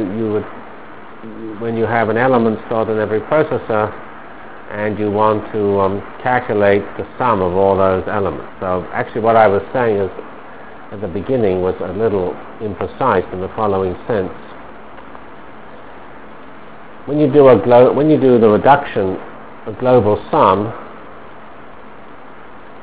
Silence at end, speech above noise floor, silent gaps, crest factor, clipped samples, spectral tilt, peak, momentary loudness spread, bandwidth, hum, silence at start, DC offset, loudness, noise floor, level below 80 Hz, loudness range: 0 s; 23 dB; none; 16 dB; under 0.1%; -11 dB/octave; 0 dBFS; 25 LU; 4 kHz; none; 0 s; 2%; -15 LUFS; -38 dBFS; -44 dBFS; 8 LU